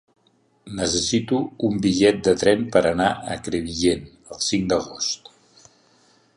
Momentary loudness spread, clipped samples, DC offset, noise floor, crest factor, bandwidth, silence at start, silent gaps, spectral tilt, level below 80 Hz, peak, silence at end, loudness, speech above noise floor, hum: 10 LU; under 0.1%; under 0.1%; -62 dBFS; 20 dB; 11.5 kHz; 0.65 s; none; -4 dB/octave; -48 dBFS; -2 dBFS; 1.2 s; -21 LUFS; 41 dB; none